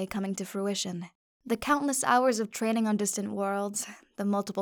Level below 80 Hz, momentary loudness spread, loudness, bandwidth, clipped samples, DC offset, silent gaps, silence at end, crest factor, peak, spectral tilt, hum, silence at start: -64 dBFS; 10 LU; -29 LUFS; over 20 kHz; under 0.1%; under 0.1%; 1.15-1.40 s; 0 s; 18 dB; -10 dBFS; -4 dB/octave; none; 0 s